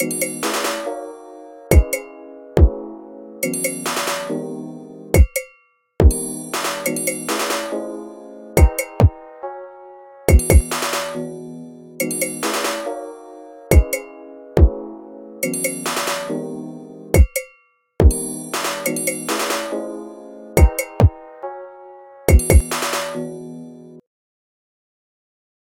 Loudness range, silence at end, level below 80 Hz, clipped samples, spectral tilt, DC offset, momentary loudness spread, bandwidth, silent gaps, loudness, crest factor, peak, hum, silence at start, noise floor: 3 LU; 1.7 s; -22 dBFS; under 0.1%; -5 dB/octave; under 0.1%; 21 LU; 17 kHz; none; -19 LUFS; 18 dB; 0 dBFS; none; 0 s; -56 dBFS